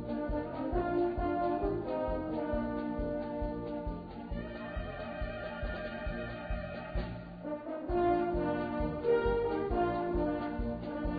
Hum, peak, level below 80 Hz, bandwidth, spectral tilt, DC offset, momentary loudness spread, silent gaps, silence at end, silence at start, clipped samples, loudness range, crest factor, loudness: none; -18 dBFS; -44 dBFS; 5 kHz; -6.5 dB/octave; under 0.1%; 10 LU; none; 0 s; 0 s; under 0.1%; 7 LU; 16 dB; -35 LUFS